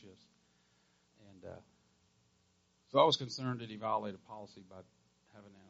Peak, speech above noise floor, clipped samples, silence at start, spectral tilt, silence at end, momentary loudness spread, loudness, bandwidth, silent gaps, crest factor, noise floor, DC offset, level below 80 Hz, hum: -12 dBFS; 38 dB; under 0.1%; 0.05 s; -3.5 dB/octave; 0.2 s; 26 LU; -34 LUFS; 7.6 kHz; none; 26 dB; -74 dBFS; under 0.1%; -80 dBFS; none